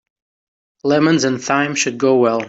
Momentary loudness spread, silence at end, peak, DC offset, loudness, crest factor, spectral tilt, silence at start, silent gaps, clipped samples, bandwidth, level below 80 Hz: 4 LU; 0 s; -4 dBFS; under 0.1%; -16 LUFS; 14 dB; -4.5 dB/octave; 0.85 s; none; under 0.1%; 8 kHz; -62 dBFS